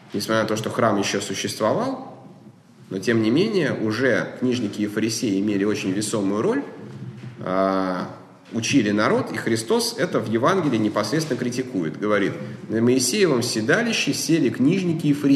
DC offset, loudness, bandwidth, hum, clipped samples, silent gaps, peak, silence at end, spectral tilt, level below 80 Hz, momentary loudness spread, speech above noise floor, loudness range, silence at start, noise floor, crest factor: under 0.1%; -22 LUFS; 13 kHz; none; under 0.1%; none; -4 dBFS; 0 s; -4.5 dB/octave; -66 dBFS; 8 LU; 26 dB; 3 LU; 0.05 s; -47 dBFS; 18 dB